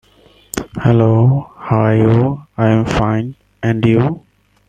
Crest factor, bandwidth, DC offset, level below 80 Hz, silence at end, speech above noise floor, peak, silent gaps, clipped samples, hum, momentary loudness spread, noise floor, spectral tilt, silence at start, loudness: 14 dB; 14.5 kHz; under 0.1%; -38 dBFS; 0.5 s; 36 dB; 0 dBFS; none; under 0.1%; none; 13 LU; -48 dBFS; -8 dB/octave; 0.55 s; -14 LUFS